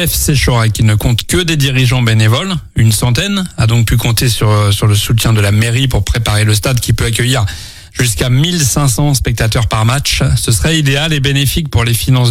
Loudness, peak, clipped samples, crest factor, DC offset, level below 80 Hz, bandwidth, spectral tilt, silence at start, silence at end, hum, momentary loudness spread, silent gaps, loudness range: -11 LUFS; 0 dBFS; under 0.1%; 10 dB; under 0.1%; -24 dBFS; 16.5 kHz; -4.5 dB/octave; 0 s; 0 s; none; 3 LU; none; 1 LU